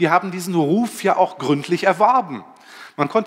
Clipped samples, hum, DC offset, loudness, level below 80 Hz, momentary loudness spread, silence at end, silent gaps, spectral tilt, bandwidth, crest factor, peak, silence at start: under 0.1%; none; under 0.1%; -19 LUFS; -74 dBFS; 12 LU; 0 s; none; -5.5 dB/octave; 16 kHz; 18 dB; -2 dBFS; 0 s